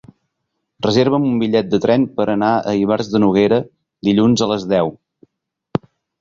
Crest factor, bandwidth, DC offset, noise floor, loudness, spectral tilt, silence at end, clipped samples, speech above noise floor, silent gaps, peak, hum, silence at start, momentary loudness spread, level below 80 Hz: 16 dB; 7.8 kHz; under 0.1%; -74 dBFS; -17 LUFS; -6.5 dB/octave; 1.25 s; under 0.1%; 59 dB; none; -2 dBFS; none; 0.8 s; 10 LU; -52 dBFS